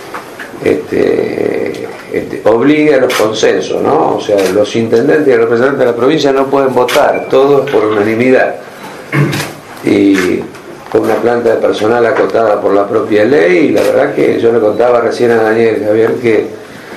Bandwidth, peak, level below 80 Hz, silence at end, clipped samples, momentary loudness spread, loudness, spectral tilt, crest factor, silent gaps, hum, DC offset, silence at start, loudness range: 14 kHz; 0 dBFS; -50 dBFS; 0 s; 0.5%; 10 LU; -10 LUFS; -5.5 dB/octave; 10 dB; none; none; under 0.1%; 0 s; 3 LU